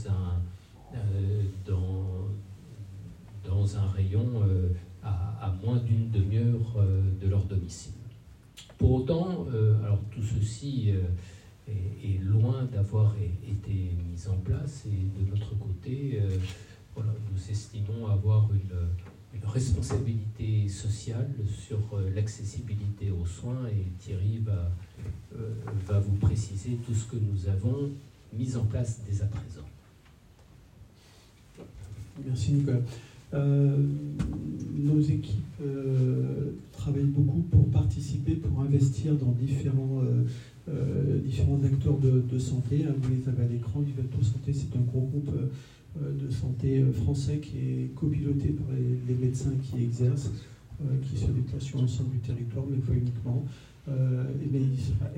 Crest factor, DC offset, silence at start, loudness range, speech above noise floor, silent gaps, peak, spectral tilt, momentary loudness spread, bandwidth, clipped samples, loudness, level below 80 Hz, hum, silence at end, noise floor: 18 dB; under 0.1%; 0 s; 6 LU; 28 dB; none; -10 dBFS; -8.5 dB/octave; 12 LU; 9.8 kHz; under 0.1%; -29 LUFS; -48 dBFS; none; 0 s; -56 dBFS